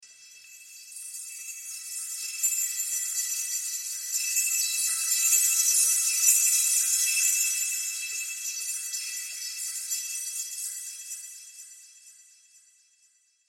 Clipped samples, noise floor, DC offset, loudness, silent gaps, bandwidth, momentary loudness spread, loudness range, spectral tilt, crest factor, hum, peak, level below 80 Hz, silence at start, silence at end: under 0.1%; -66 dBFS; under 0.1%; -24 LUFS; none; 16.5 kHz; 17 LU; 13 LU; 6.5 dB/octave; 22 dB; none; -8 dBFS; -88 dBFS; 0 s; 1.35 s